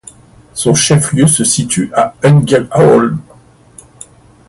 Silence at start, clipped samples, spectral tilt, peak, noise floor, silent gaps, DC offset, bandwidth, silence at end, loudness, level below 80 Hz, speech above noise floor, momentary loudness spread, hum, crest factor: 0.55 s; under 0.1%; -5 dB/octave; 0 dBFS; -42 dBFS; none; under 0.1%; 12 kHz; 1.25 s; -10 LUFS; -44 dBFS; 33 dB; 8 LU; none; 12 dB